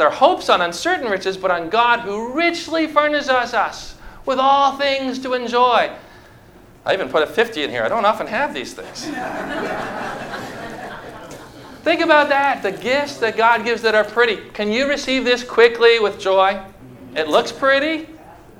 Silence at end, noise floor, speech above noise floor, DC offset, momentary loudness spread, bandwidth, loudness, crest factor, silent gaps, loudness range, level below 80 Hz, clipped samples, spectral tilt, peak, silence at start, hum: 0.2 s; -45 dBFS; 27 dB; under 0.1%; 16 LU; 16.5 kHz; -18 LUFS; 18 dB; none; 6 LU; -50 dBFS; under 0.1%; -3.5 dB/octave; 0 dBFS; 0 s; none